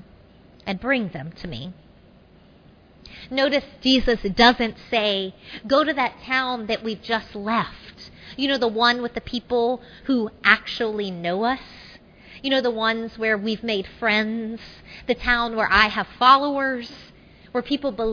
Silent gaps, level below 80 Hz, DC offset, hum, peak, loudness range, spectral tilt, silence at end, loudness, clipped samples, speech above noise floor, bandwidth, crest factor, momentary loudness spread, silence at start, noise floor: none; -44 dBFS; under 0.1%; none; 0 dBFS; 4 LU; -5 dB/octave; 0 s; -22 LUFS; under 0.1%; 29 dB; 5.4 kHz; 22 dB; 17 LU; 0.65 s; -51 dBFS